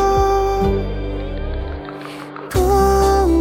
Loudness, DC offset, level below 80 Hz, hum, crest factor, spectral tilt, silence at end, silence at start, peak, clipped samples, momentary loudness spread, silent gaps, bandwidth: -18 LUFS; under 0.1%; -24 dBFS; none; 12 dB; -6.5 dB/octave; 0 s; 0 s; -4 dBFS; under 0.1%; 16 LU; none; 17 kHz